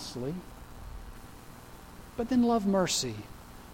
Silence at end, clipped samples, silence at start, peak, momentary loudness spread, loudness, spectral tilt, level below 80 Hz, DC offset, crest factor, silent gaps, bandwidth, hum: 0 s; under 0.1%; 0 s; -14 dBFS; 23 LU; -29 LUFS; -4.5 dB/octave; -50 dBFS; under 0.1%; 18 dB; none; 17 kHz; none